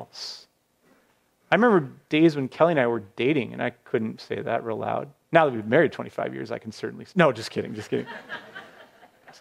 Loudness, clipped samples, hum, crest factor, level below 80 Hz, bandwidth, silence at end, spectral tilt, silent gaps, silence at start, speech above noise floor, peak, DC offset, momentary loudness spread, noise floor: -24 LUFS; under 0.1%; none; 22 dB; -70 dBFS; 12.5 kHz; 0.1 s; -6.5 dB/octave; none; 0 s; 41 dB; -2 dBFS; under 0.1%; 15 LU; -65 dBFS